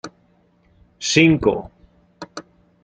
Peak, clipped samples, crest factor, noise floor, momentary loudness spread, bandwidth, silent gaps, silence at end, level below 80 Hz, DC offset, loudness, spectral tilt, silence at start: -2 dBFS; under 0.1%; 20 dB; -59 dBFS; 25 LU; 9 kHz; none; 0.4 s; -48 dBFS; under 0.1%; -17 LUFS; -4.5 dB/octave; 0.05 s